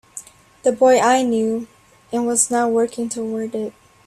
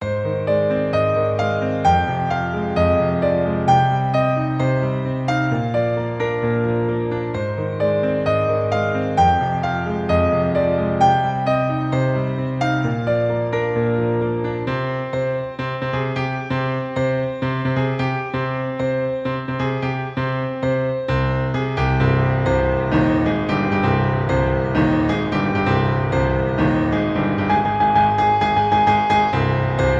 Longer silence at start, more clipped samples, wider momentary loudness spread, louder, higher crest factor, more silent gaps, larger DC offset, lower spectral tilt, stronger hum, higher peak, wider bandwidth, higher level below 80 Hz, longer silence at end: first, 0.15 s vs 0 s; neither; first, 16 LU vs 7 LU; about the same, -19 LUFS vs -20 LUFS; about the same, 18 dB vs 16 dB; neither; neither; second, -3 dB/octave vs -8 dB/octave; neither; about the same, -2 dBFS vs -4 dBFS; first, 14 kHz vs 8 kHz; second, -62 dBFS vs -36 dBFS; first, 0.35 s vs 0 s